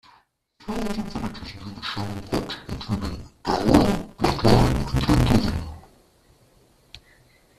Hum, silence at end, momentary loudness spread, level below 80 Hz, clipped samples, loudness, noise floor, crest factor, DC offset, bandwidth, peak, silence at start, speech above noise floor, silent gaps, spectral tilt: none; 0.6 s; 15 LU; -34 dBFS; under 0.1%; -24 LUFS; -60 dBFS; 22 dB; under 0.1%; 14.5 kHz; -2 dBFS; 0.65 s; 31 dB; none; -6.5 dB/octave